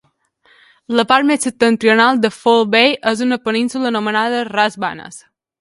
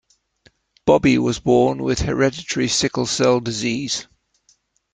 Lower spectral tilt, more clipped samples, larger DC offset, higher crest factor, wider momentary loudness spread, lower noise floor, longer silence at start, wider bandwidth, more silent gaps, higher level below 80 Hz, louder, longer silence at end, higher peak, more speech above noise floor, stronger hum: about the same, -3.5 dB/octave vs -4.5 dB/octave; neither; neither; about the same, 16 dB vs 18 dB; about the same, 7 LU vs 7 LU; second, -57 dBFS vs -61 dBFS; about the same, 0.9 s vs 0.85 s; first, 11.5 kHz vs 9.4 kHz; neither; second, -62 dBFS vs -42 dBFS; first, -15 LUFS vs -19 LUFS; second, 0.4 s vs 0.9 s; about the same, 0 dBFS vs -2 dBFS; about the same, 42 dB vs 43 dB; neither